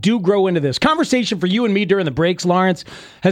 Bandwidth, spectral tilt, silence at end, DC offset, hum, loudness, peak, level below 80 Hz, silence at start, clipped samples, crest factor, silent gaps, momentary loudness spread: 13.5 kHz; -5.5 dB/octave; 0 s; under 0.1%; none; -17 LUFS; -2 dBFS; -48 dBFS; 0 s; under 0.1%; 14 dB; none; 4 LU